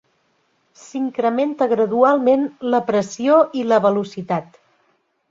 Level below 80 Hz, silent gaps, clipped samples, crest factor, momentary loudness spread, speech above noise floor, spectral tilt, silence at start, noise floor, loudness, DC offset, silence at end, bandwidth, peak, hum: -66 dBFS; none; under 0.1%; 16 dB; 10 LU; 47 dB; -6 dB/octave; 0.95 s; -64 dBFS; -18 LUFS; under 0.1%; 0.9 s; 7.8 kHz; -2 dBFS; none